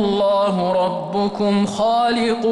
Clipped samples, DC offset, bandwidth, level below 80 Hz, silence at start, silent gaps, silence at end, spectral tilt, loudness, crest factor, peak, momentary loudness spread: under 0.1%; under 0.1%; 11.5 kHz; -52 dBFS; 0 s; none; 0 s; -6 dB/octave; -18 LUFS; 8 dB; -10 dBFS; 4 LU